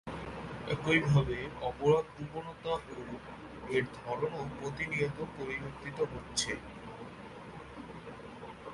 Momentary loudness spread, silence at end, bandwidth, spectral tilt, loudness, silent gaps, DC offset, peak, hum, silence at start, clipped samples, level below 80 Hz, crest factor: 18 LU; 0 s; 11.5 kHz; -5 dB/octave; -34 LUFS; none; under 0.1%; -14 dBFS; none; 0.05 s; under 0.1%; -56 dBFS; 22 dB